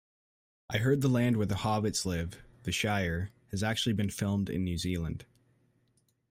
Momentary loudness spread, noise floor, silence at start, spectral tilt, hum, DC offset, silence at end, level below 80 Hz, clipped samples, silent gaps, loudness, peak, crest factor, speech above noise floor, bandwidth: 10 LU; -73 dBFS; 0.7 s; -5 dB/octave; none; under 0.1%; 1.05 s; -54 dBFS; under 0.1%; none; -31 LUFS; -16 dBFS; 18 dB; 42 dB; 16 kHz